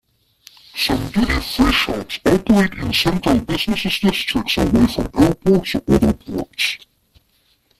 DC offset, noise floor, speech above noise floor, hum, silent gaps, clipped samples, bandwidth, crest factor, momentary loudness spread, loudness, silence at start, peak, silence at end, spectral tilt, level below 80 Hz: under 0.1%; -61 dBFS; 44 dB; none; none; under 0.1%; 15 kHz; 16 dB; 6 LU; -17 LUFS; 0.75 s; -2 dBFS; 1.05 s; -5 dB/octave; -32 dBFS